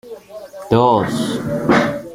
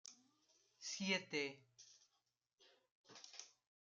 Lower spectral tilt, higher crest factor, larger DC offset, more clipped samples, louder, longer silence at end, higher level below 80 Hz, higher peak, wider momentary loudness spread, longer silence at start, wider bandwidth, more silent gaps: first, -6 dB/octave vs -2.5 dB/octave; second, 16 dB vs 24 dB; neither; neither; first, -16 LUFS vs -45 LUFS; second, 0 s vs 0.4 s; first, -46 dBFS vs under -90 dBFS; first, -2 dBFS vs -26 dBFS; about the same, 21 LU vs 23 LU; about the same, 0.05 s vs 0.05 s; first, 16 kHz vs 9.4 kHz; second, none vs 2.53-2.58 s, 2.91-3.04 s